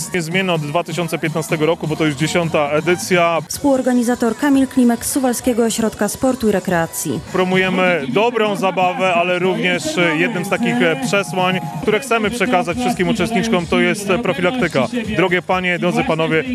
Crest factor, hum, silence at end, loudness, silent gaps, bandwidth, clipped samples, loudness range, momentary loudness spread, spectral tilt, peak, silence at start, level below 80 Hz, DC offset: 16 dB; none; 0 s; -17 LUFS; none; 13.5 kHz; under 0.1%; 1 LU; 4 LU; -4.5 dB/octave; -2 dBFS; 0 s; -46 dBFS; under 0.1%